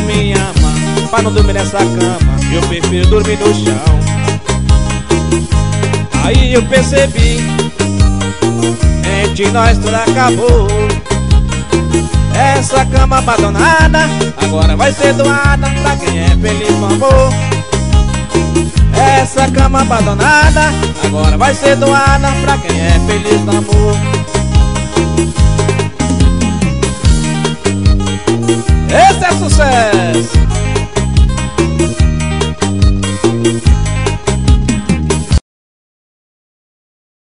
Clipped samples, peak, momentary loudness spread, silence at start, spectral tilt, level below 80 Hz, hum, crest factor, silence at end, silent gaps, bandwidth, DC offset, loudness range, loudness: under 0.1%; 0 dBFS; 5 LU; 0 s; -5 dB/octave; -16 dBFS; none; 10 dB; 1.85 s; none; 11 kHz; 4%; 3 LU; -11 LUFS